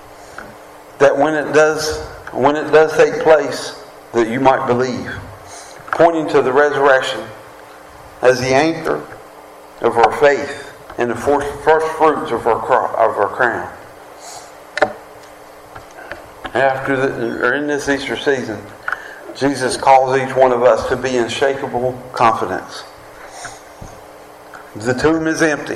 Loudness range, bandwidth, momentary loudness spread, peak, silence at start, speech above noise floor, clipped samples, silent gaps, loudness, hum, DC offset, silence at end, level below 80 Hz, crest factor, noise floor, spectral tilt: 6 LU; 14 kHz; 22 LU; 0 dBFS; 0 s; 24 dB; under 0.1%; none; -16 LUFS; none; under 0.1%; 0 s; -46 dBFS; 16 dB; -38 dBFS; -4.5 dB/octave